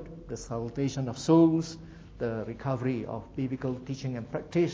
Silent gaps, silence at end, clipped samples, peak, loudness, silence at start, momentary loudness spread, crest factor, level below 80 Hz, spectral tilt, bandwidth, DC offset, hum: none; 0 s; under 0.1%; -10 dBFS; -30 LUFS; 0 s; 16 LU; 20 dB; -54 dBFS; -7 dB/octave; 8 kHz; under 0.1%; none